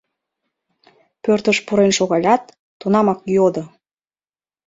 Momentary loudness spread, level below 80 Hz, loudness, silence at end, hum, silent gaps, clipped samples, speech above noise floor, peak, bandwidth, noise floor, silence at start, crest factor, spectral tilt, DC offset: 11 LU; -60 dBFS; -17 LUFS; 1 s; none; 2.59-2.80 s; under 0.1%; over 74 dB; -2 dBFS; 7.8 kHz; under -90 dBFS; 1.25 s; 18 dB; -5 dB/octave; under 0.1%